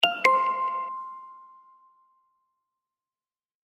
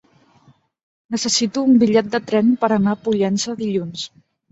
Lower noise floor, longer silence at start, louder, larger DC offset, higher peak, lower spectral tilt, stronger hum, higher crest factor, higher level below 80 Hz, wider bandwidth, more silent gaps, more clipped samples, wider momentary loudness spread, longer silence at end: first, under -90 dBFS vs -55 dBFS; second, 0 s vs 1.1 s; second, -25 LUFS vs -18 LUFS; neither; about the same, -4 dBFS vs -2 dBFS; second, -1 dB/octave vs -4.5 dB/octave; neither; first, 26 dB vs 16 dB; second, under -90 dBFS vs -60 dBFS; first, 13.5 kHz vs 8.2 kHz; neither; neither; first, 23 LU vs 12 LU; first, 2.2 s vs 0.45 s